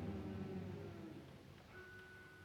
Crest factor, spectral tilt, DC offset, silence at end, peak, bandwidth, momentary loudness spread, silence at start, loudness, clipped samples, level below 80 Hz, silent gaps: 16 dB; -7.5 dB/octave; under 0.1%; 0 s; -36 dBFS; 18 kHz; 11 LU; 0 s; -52 LUFS; under 0.1%; -66 dBFS; none